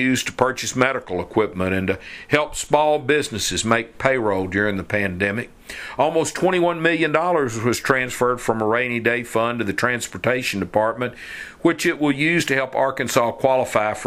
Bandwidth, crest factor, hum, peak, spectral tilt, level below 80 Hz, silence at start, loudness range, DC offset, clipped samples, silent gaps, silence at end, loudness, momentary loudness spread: 16 kHz; 20 dB; none; 0 dBFS; -4.5 dB/octave; -50 dBFS; 0 s; 2 LU; under 0.1%; under 0.1%; none; 0 s; -20 LUFS; 5 LU